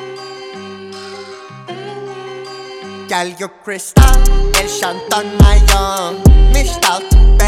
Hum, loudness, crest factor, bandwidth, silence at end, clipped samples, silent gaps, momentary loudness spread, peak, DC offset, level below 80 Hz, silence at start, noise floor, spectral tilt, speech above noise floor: none; -13 LUFS; 12 dB; 16 kHz; 0 s; 0.3%; none; 20 LU; 0 dBFS; under 0.1%; -12 dBFS; 0 s; -32 dBFS; -4.5 dB/octave; 22 dB